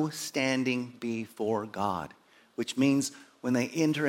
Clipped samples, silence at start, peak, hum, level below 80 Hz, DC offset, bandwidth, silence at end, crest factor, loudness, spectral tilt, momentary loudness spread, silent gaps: under 0.1%; 0 s; -12 dBFS; none; -72 dBFS; under 0.1%; 16.5 kHz; 0 s; 18 dB; -30 LUFS; -4.5 dB/octave; 11 LU; none